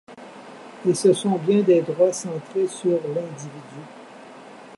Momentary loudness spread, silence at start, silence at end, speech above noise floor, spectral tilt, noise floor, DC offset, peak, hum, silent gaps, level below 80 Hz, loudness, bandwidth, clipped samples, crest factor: 24 LU; 0.1 s; 0 s; 21 dB; -6 dB/octave; -43 dBFS; under 0.1%; -6 dBFS; none; none; -76 dBFS; -21 LUFS; 11.5 kHz; under 0.1%; 18 dB